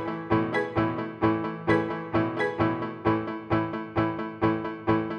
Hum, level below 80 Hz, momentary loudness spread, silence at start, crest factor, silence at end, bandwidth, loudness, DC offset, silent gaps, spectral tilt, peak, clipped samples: none; -52 dBFS; 3 LU; 0 s; 16 dB; 0 s; 6.4 kHz; -27 LUFS; under 0.1%; none; -8.5 dB/octave; -10 dBFS; under 0.1%